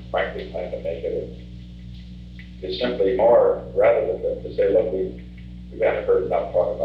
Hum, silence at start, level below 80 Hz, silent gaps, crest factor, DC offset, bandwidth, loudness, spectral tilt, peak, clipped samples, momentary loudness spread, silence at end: 60 Hz at -40 dBFS; 0 s; -42 dBFS; none; 16 dB; 0.1%; 5.8 kHz; -22 LUFS; -8 dB/octave; -6 dBFS; under 0.1%; 22 LU; 0 s